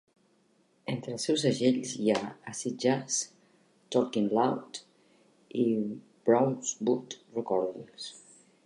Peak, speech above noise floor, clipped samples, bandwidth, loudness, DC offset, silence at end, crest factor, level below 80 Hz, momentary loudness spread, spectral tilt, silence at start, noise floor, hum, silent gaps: -10 dBFS; 39 dB; under 0.1%; 11.5 kHz; -30 LUFS; under 0.1%; 0.45 s; 20 dB; -78 dBFS; 15 LU; -4.5 dB/octave; 0.85 s; -68 dBFS; none; none